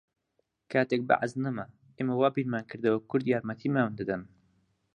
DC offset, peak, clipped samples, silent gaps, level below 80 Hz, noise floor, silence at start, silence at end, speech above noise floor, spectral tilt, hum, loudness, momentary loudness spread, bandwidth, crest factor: under 0.1%; -8 dBFS; under 0.1%; none; -70 dBFS; -77 dBFS; 0.7 s; 0.7 s; 49 dB; -7.5 dB/octave; none; -30 LUFS; 8 LU; 9.6 kHz; 22 dB